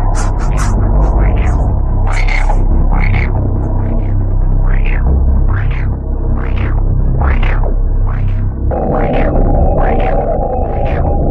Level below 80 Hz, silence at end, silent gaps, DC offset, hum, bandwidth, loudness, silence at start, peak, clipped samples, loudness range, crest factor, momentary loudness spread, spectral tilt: -12 dBFS; 0 s; none; under 0.1%; none; 8.6 kHz; -15 LUFS; 0 s; -2 dBFS; under 0.1%; 1 LU; 10 dB; 4 LU; -7.5 dB/octave